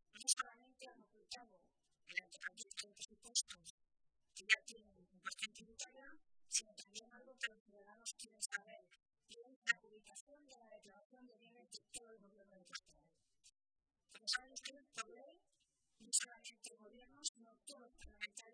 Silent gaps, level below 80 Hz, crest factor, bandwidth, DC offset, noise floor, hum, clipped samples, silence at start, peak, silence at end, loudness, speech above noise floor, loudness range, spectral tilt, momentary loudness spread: 3.70-3.78 s, 7.60-7.66 s, 9.56-9.62 s, 10.21-10.27 s, 11.05-11.10 s, 17.29-17.35 s; -80 dBFS; 32 dB; 10.5 kHz; under 0.1%; -84 dBFS; none; under 0.1%; 0.15 s; -18 dBFS; 0.05 s; -45 LUFS; 34 dB; 9 LU; 2 dB/octave; 25 LU